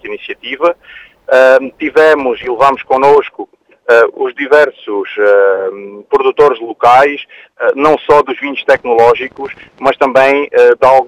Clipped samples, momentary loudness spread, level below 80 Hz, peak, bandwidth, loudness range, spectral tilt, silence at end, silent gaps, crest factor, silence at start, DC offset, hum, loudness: 1%; 15 LU; -48 dBFS; 0 dBFS; 11 kHz; 1 LU; -5 dB/octave; 0 s; none; 10 dB; 0.05 s; under 0.1%; none; -10 LUFS